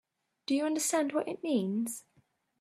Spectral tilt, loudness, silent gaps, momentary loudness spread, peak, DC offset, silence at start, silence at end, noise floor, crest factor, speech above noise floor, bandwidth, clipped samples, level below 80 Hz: -4 dB/octave; -32 LUFS; none; 10 LU; -16 dBFS; under 0.1%; 0.5 s; 0.6 s; -71 dBFS; 16 dB; 40 dB; 15.5 kHz; under 0.1%; -82 dBFS